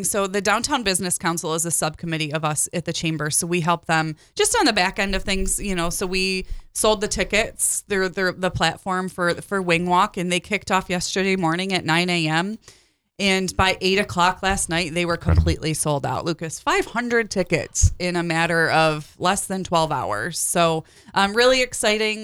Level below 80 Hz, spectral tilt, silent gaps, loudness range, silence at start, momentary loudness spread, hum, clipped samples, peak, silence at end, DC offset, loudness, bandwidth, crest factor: -36 dBFS; -3.5 dB/octave; none; 1 LU; 0 s; 6 LU; none; under 0.1%; -6 dBFS; 0 s; under 0.1%; -21 LUFS; over 20 kHz; 16 dB